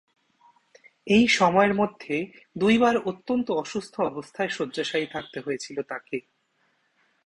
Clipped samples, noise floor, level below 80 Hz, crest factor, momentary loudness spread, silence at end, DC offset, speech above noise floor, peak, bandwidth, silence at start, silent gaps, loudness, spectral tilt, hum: under 0.1%; -70 dBFS; -62 dBFS; 20 dB; 14 LU; 1.05 s; under 0.1%; 45 dB; -6 dBFS; 11 kHz; 1.05 s; none; -25 LUFS; -5 dB/octave; none